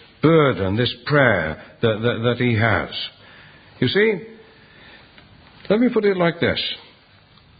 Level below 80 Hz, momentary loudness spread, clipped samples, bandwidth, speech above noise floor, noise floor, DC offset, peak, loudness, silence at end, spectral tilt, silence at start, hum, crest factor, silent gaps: -46 dBFS; 11 LU; under 0.1%; 5 kHz; 33 dB; -51 dBFS; under 0.1%; 0 dBFS; -19 LUFS; 0.8 s; -11 dB/octave; 0.25 s; none; 20 dB; none